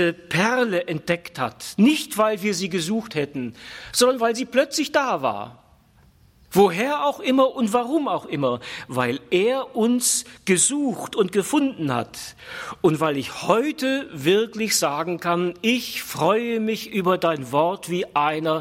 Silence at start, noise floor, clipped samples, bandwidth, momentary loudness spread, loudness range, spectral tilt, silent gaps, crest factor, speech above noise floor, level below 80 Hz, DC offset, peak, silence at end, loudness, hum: 0 s; -55 dBFS; under 0.1%; 16.5 kHz; 9 LU; 2 LU; -4 dB/octave; none; 20 dB; 33 dB; -62 dBFS; under 0.1%; -2 dBFS; 0 s; -22 LUFS; none